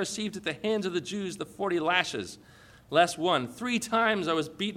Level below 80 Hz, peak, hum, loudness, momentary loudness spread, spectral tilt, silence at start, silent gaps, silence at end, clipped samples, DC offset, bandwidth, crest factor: -66 dBFS; -8 dBFS; none; -28 LUFS; 10 LU; -3.5 dB/octave; 0 s; none; 0 s; under 0.1%; under 0.1%; 16 kHz; 20 dB